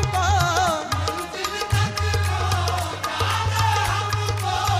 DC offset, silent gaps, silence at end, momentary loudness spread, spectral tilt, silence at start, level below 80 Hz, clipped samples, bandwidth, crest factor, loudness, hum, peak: under 0.1%; none; 0 s; 6 LU; -4 dB/octave; 0 s; -36 dBFS; under 0.1%; 15.5 kHz; 16 dB; -22 LUFS; none; -6 dBFS